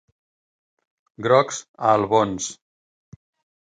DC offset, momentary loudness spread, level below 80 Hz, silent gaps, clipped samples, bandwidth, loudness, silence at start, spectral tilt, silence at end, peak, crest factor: under 0.1%; 11 LU; -60 dBFS; 1.68-1.74 s; under 0.1%; 9.6 kHz; -21 LUFS; 1.2 s; -4.5 dB/octave; 1.1 s; -2 dBFS; 22 dB